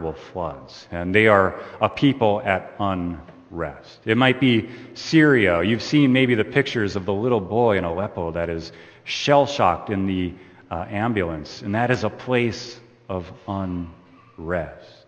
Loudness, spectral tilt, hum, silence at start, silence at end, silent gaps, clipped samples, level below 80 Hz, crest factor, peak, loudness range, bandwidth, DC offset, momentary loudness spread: -21 LUFS; -6.5 dB/octave; none; 0 s; 0.2 s; none; under 0.1%; -50 dBFS; 22 dB; 0 dBFS; 7 LU; 8.8 kHz; under 0.1%; 16 LU